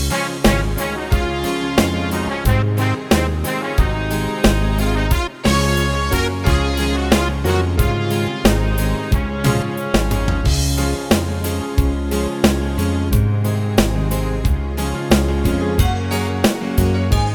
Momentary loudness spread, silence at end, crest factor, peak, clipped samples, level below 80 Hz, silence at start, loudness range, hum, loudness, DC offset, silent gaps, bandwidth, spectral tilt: 4 LU; 0 s; 16 dB; 0 dBFS; under 0.1%; -22 dBFS; 0 s; 1 LU; none; -18 LUFS; under 0.1%; none; over 20 kHz; -5.5 dB/octave